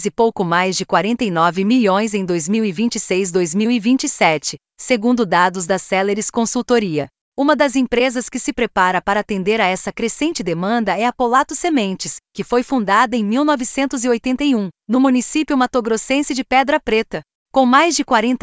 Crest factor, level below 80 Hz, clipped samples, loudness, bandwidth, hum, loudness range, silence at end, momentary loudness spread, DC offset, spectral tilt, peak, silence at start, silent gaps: 16 dB; -50 dBFS; under 0.1%; -17 LUFS; 8 kHz; none; 2 LU; 0.05 s; 6 LU; under 0.1%; -4 dB/octave; 0 dBFS; 0 s; 7.21-7.32 s, 17.35-17.46 s